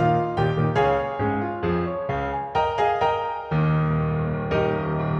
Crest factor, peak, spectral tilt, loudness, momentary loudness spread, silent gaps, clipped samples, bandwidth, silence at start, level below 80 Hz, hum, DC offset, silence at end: 14 dB; -8 dBFS; -8.5 dB/octave; -23 LUFS; 5 LU; none; under 0.1%; 6.6 kHz; 0 s; -42 dBFS; none; under 0.1%; 0 s